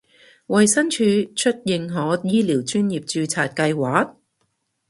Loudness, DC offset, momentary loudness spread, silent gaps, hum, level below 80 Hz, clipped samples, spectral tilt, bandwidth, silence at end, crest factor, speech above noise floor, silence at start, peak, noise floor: -20 LUFS; under 0.1%; 7 LU; none; none; -64 dBFS; under 0.1%; -4.5 dB/octave; 11.5 kHz; 0.8 s; 18 dB; 51 dB; 0.5 s; -2 dBFS; -71 dBFS